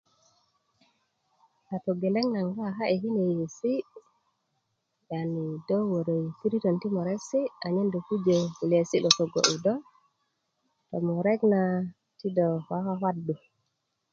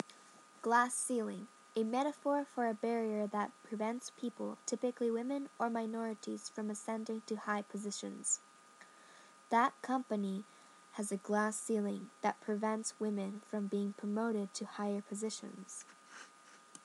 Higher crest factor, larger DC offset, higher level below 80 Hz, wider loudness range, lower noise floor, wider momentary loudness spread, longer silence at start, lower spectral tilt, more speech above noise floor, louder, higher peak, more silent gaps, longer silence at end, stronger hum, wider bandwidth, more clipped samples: first, 26 dB vs 20 dB; neither; first, -74 dBFS vs under -90 dBFS; about the same, 5 LU vs 4 LU; first, -79 dBFS vs -61 dBFS; second, 10 LU vs 14 LU; first, 1.7 s vs 0.1 s; about the same, -5 dB/octave vs -4 dB/octave; first, 52 dB vs 23 dB; first, -28 LUFS vs -38 LUFS; first, -2 dBFS vs -18 dBFS; neither; first, 0.75 s vs 0.05 s; neither; second, 7.8 kHz vs 12.5 kHz; neither